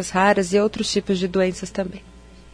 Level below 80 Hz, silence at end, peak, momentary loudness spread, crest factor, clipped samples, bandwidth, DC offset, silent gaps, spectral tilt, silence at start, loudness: -46 dBFS; 0.15 s; -4 dBFS; 11 LU; 16 dB; under 0.1%; 10.5 kHz; under 0.1%; none; -4.5 dB/octave; 0 s; -21 LUFS